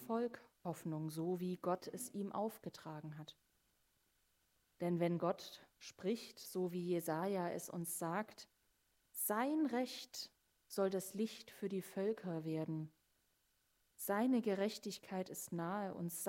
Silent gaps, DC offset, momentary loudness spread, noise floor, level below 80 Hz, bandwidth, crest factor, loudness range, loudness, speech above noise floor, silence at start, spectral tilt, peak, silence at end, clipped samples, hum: none; under 0.1%; 13 LU; -80 dBFS; -86 dBFS; 16 kHz; 18 dB; 4 LU; -42 LUFS; 39 dB; 0 s; -5.5 dB/octave; -24 dBFS; 0 s; under 0.1%; none